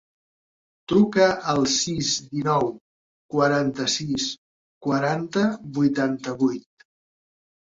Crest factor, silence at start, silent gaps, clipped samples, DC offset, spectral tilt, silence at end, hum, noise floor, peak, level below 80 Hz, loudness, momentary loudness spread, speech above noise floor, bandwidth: 20 dB; 0.9 s; 2.81-3.29 s, 4.38-4.81 s; under 0.1%; under 0.1%; -4.5 dB/octave; 1.05 s; none; under -90 dBFS; -6 dBFS; -58 dBFS; -23 LUFS; 8 LU; over 68 dB; 7.8 kHz